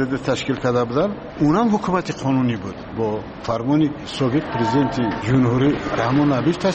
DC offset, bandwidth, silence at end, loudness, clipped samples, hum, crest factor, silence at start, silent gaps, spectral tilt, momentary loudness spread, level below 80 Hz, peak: under 0.1%; 8.4 kHz; 0 s; -20 LUFS; under 0.1%; none; 12 dB; 0 s; none; -7 dB/octave; 7 LU; -44 dBFS; -8 dBFS